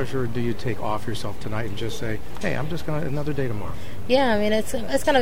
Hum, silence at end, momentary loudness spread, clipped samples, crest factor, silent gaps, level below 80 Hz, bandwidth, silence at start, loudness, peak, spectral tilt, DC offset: none; 0 s; 10 LU; under 0.1%; 18 dB; none; -42 dBFS; 16 kHz; 0 s; -26 LUFS; -6 dBFS; -5.5 dB/octave; 7%